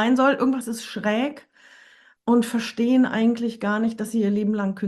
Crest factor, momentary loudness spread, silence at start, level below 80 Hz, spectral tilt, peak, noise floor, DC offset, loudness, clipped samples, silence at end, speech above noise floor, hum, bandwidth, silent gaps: 14 dB; 8 LU; 0 s; -68 dBFS; -5.5 dB/octave; -8 dBFS; -53 dBFS; under 0.1%; -22 LUFS; under 0.1%; 0 s; 32 dB; none; 12.5 kHz; none